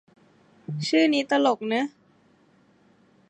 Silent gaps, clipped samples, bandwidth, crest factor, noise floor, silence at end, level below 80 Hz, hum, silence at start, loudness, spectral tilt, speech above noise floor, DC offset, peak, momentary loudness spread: none; under 0.1%; 9.8 kHz; 18 dB; -60 dBFS; 1.4 s; -80 dBFS; none; 0.7 s; -24 LUFS; -5 dB/octave; 37 dB; under 0.1%; -8 dBFS; 14 LU